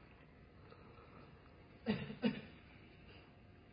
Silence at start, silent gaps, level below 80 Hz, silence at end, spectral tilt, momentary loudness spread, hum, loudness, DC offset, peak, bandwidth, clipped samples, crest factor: 0 s; none; -68 dBFS; 0 s; -5 dB/octave; 21 LU; none; -42 LUFS; under 0.1%; -24 dBFS; 5 kHz; under 0.1%; 24 dB